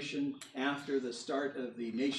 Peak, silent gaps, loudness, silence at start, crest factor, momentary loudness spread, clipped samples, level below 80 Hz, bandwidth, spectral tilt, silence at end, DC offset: -20 dBFS; none; -37 LUFS; 0 s; 16 dB; 4 LU; under 0.1%; -86 dBFS; 12 kHz; -4 dB/octave; 0 s; under 0.1%